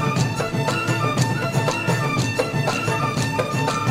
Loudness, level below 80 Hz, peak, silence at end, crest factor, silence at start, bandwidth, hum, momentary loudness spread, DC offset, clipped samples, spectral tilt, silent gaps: -21 LUFS; -48 dBFS; -4 dBFS; 0 s; 16 dB; 0 s; 16 kHz; none; 1 LU; under 0.1%; under 0.1%; -5 dB/octave; none